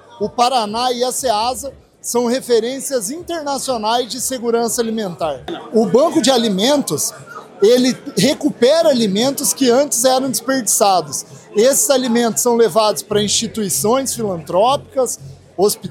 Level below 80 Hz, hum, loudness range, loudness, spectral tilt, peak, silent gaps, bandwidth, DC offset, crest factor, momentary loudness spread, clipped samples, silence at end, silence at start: -54 dBFS; none; 4 LU; -16 LUFS; -3 dB/octave; 0 dBFS; none; 17 kHz; under 0.1%; 16 dB; 9 LU; under 0.1%; 0 s; 0.1 s